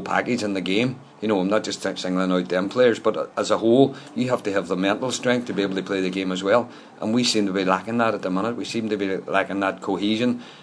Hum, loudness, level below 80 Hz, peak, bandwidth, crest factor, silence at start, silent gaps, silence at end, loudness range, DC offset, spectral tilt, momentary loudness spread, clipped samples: none; -23 LUFS; -70 dBFS; -2 dBFS; 11 kHz; 20 dB; 0 s; none; 0 s; 2 LU; under 0.1%; -5 dB/octave; 7 LU; under 0.1%